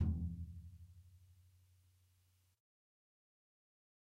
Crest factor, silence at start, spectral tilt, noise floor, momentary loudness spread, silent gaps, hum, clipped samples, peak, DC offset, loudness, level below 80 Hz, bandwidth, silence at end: 22 dB; 0 s; -9.5 dB/octave; -76 dBFS; 25 LU; none; none; under 0.1%; -26 dBFS; under 0.1%; -46 LUFS; -54 dBFS; 3.1 kHz; 2.7 s